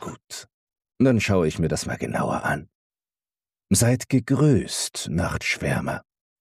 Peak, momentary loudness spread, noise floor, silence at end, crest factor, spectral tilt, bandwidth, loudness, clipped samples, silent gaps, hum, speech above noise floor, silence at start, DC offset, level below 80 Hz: -8 dBFS; 12 LU; under -90 dBFS; 0.4 s; 16 dB; -5 dB/octave; 15.5 kHz; -23 LUFS; under 0.1%; 0.54-0.67 s, 2.75-2.90 s; none; over 68 dB; 0 s; under 0.1%; -46 dBFS